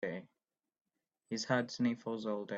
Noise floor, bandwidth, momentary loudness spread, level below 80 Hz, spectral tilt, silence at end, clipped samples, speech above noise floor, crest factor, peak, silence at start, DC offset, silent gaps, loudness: -87 dBFS; 7.8 kHz; 9 LU; -80 dBFS; -5 dB/octave; 0 s; under 0.1%; 51 dB; 20 dB; -18 dBFS; 0 s; under 0.1%; 0.81-0.85 s; -37 LUFS